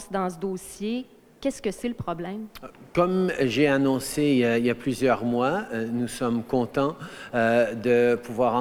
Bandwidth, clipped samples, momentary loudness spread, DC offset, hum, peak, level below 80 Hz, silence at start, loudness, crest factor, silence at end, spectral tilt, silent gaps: 16.5 kHz; under 0.1%; 11 LU; under 0.1%; none; -8 dBFS; -54 dBFS; 0 s; -25 LUFS; 16 dB; 0 s; -5.5 dB/octave; none